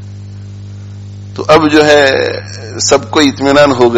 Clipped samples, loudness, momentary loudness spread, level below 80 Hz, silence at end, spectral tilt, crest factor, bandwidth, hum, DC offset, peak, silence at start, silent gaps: 0.8%; -9 LUFS; 22 LU; -42 dBFS; 0 s; -4 dB/octave; 10 dB; 13 kHz; 50 Hz at -25 dBFS; under 0.1%; 0 dBFS; 0 s; none